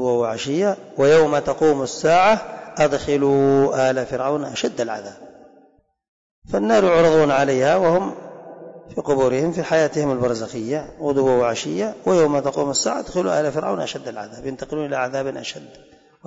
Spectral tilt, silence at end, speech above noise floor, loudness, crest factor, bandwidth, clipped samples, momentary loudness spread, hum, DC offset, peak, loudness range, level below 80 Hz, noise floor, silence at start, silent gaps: -5 dB/octave; 0.55 s; 38 dB; -19 LUFS; 12 dB; 8 kHz; under 0.1%; 16 LU; none; under 0.1%; -8 dBFS; 5 LU; -52 dBFS; -57 dBFS; 0 s; 6.08-6.42 s